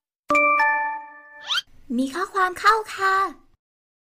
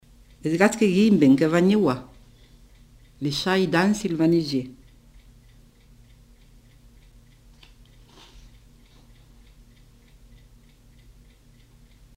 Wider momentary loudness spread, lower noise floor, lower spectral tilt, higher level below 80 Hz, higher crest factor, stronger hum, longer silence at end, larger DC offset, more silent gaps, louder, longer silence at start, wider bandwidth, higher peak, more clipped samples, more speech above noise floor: about the same, 11 LU vs 13 LU; second, -41 dBFS vs -53 dBFS; second, -2 dB/octave vs -6 dB/octave; about the same, -56 dBFS vs -52 dBFS; second, 16 dB vs 22 dB; neither; second, 0.7 s vs 7.45 s; neither; neither; about the same, -21 LUFS vs -21 LUFS; second, 0.3 s vs 0.45 s; about the same, 16 kHz vs 16 kHz; second, -8 dBFS vs -4 dBFS; neither; second, 19 dB vs 33 dB